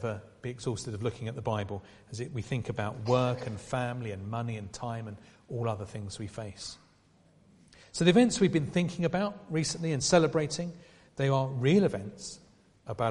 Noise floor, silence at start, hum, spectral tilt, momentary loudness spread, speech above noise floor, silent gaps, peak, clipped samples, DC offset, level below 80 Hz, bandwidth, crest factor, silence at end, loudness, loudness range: -63 dBFS; 0 s; none; -5.5 dB/octave; 18 LU; 33 dB; none; -8 dBFS; under 0.1%; under 0.1%; -60 dBFS; 11.5 kHz; 22 dB; 0 s; -31 LUFS; 10 LU